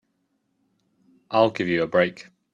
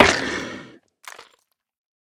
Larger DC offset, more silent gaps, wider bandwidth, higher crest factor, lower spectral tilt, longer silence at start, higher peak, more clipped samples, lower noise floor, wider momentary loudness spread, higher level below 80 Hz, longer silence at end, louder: neither; neither; second, 7.6 kHz vs 17.5 kHz; about the same, 20 dB vs 24 dB; first, -6.5 dB/octave vs -3 dB/octave; first, 1.3 s vs 0 s; second, -4 dBFS vs 0 dBFS; neither; first, -72 dBFS vs -65 dBFS; second, 5 LU vs 24 LU; second, -66 dBFS vs -46 dBFS; second, 0.3 s vs 0.95 s; about the same, -22 LUFS vs -22 LUFS